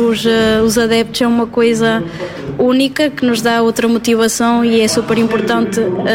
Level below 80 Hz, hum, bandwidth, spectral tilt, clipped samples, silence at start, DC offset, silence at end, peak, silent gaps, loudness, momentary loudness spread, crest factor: -44 dBFS; none; 16.5 kHz; -4 dB/octave; under 0.1%; 0 s; under 0.1%; 0 s; -2 dBFS; none; -13 LUFS; 4 LU; 12 dB